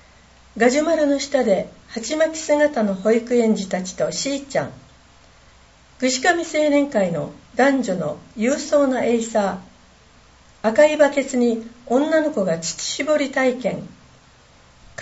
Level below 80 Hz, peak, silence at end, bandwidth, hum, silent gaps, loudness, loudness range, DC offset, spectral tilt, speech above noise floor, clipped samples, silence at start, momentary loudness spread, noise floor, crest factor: -56 dBFS; -2 dBFS; 0 s; 8.2 kHz; none; none; -20 LUFS; 3 LU; under 0.1%; -4 dB/octave; 31 dB; under 0.1%; 0.55 s; 9 LU; -51 dBFS; 18 dB